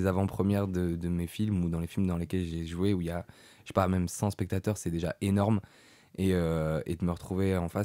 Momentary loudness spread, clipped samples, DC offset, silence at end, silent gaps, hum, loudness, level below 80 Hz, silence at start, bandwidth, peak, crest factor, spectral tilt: 5 LU; under 0.1%; under 0.1%; 0 s; none; none; -31 LUFS; -54 dBFS; 0 s; 16 kHz; -10 dBFS; 20 dB; -7 dB/octave